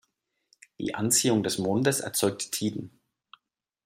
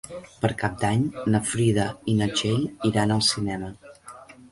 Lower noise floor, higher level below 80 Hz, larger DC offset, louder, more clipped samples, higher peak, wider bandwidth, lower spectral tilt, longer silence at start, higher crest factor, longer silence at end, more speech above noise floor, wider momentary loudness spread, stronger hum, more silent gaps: first, -78 dBFS vs -46 dBFS; second, -68 dBFS vs -50 dBFS; neither; about the same, -26 LUFS vs -24 LUFS; neither; about the same, -10 dBFS vs -8 dBFS; first, 16 kHz vs 11.5 kHz; second, -3.5 dB/octave vs -5 dB/octave; first, 0.8 s vs 0.05 s; about the same, 20 dB vs 18 dB; first, 1 s vs 0.2 s; first, 51 dB vs 22 dB; second, 13 LU vs 18 LU; neither; neither